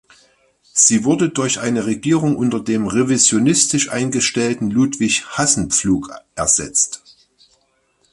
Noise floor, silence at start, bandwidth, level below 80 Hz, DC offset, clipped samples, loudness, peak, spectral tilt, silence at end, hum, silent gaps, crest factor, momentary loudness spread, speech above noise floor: -62 dBFS; 0.75 s; 11.5 kHz; -48 dBFS; under 0.1%; under 0.1%; -16 LUFS; 0 dBFS; -3.5 dB/octave; 1.15 s; none; none; 18 dB; 8 LU; 45 dB